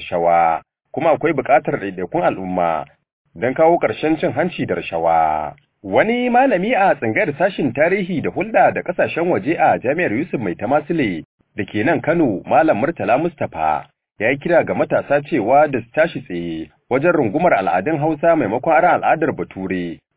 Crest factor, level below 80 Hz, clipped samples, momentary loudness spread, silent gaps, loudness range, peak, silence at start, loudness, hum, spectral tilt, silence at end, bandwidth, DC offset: 16 dB; -52 dBFS; under 0.1%; 9 LU; 3.13-3.25 s, 11.25-11.38 s; 2 LU; -2 dBFS; 0 s; -18 LUFS; none; -10.5 dB/octave; 0.2 s; 4 kHz; under 0.1%